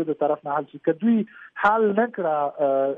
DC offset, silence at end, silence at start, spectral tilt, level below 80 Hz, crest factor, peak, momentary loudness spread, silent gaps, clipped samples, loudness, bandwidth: under 0.1%; 0 s; 0 s; -8.5 dB/octave; -68 dBFS; 16 dB; -6 dBFS; 6 LU; none; under 0.1%; -23 LUFS; 4.3 kHz